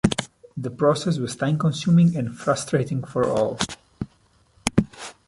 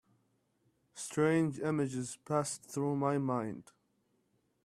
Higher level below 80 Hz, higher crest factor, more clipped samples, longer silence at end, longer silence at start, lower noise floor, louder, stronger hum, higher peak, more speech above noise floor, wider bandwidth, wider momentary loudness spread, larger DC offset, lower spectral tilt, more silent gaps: first, -48 dBFS vs -74 dBFS; about the same, 22 dB vs 18 dB; neither; second, 0.15 s vs 1.05 s; second, 0.05 s vs 0.95 s; second, -60 dBFS vs -76 dBFS; first, -23 LUFS vs -34 LUFS; neither; first, 0 dBFS vs -18 dBFS; second, 38 dB vs 43 dB; second, 11.5 kHz vs 14.5 kHz; first, 16 LU vs 13 LU; neither; about the same, -6 dB/octave vs -6 dB/octave; neither